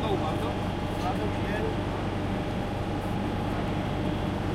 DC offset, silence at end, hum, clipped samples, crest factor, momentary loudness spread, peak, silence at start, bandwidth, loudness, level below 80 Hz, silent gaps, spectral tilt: under 0.1%; 0 s; none; under 0.1%; 14 dB; 2 LU; -16 dBFS; 0 s; 15.5 kHz; -30 LUFS; -40 dBFS; none; -7 dB/octave